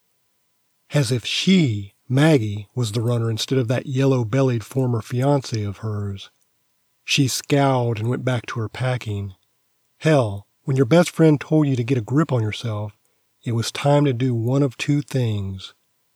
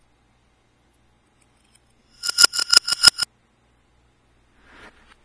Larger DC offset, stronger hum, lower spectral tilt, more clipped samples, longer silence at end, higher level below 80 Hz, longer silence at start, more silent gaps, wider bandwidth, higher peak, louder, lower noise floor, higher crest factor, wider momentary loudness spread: neither; neither; first, -6 dB/octave vs 2 dB/octave; neither; second, 0.45 s vs 2 s; second, -64 dBFS vs -58 dBFS; second, 0.9 s vs 2.2 s; neither; first, 15.5 kHz vs 11 kHz; second, -4 dBFS vs 0 dBFS; second, -21 LUFS vs -15 LUFS; first, -67 dBFS vs -62 dBFS; second, 18 dB vs 24 dB; second, 12 LU vs 15 LU